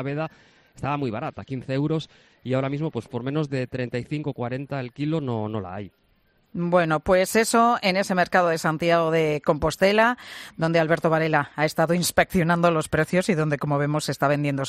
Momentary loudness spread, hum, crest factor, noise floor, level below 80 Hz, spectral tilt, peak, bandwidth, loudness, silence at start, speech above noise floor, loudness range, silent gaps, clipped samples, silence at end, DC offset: 12 LU; none; 18 dB; -64 dBFS; -52 dBFS; -5.5 dB/octave; -6 dBFS; 14.5 kHz; -23 LUFS; 0 s; 40 dB; 8 LU; none; under 0.1%; 0 s; under 0.1%